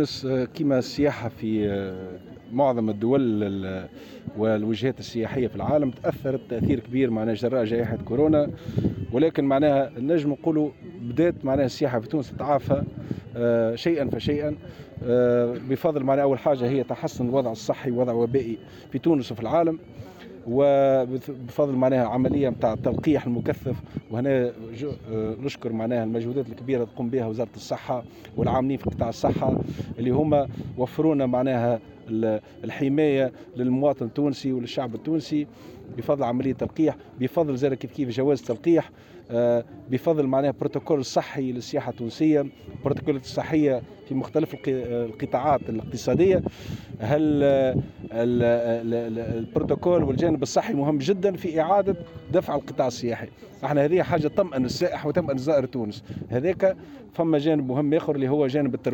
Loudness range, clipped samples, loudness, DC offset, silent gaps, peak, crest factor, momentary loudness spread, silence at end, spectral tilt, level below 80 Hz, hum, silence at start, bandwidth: 3 LU; under 0.1%; -25 LUFS; under 0.1%; none; -10 dBFS; 14 dB; 10 LU; 0 s; -7.5 dB/octave; -52 dBFS; none; 0 s; 17 kHz